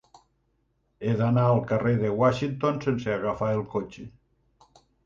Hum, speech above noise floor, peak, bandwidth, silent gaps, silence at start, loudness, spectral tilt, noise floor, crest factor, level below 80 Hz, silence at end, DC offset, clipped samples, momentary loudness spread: none; 46 dB; -10 dBFS; 7.2 kHz; none; 1 s; -26 LUFS; -8.5 dB/octave; -71 dBFS; 18 dB; -56 dBFS; 0.95 s; under 0.1%; under 0.1%; 11 LU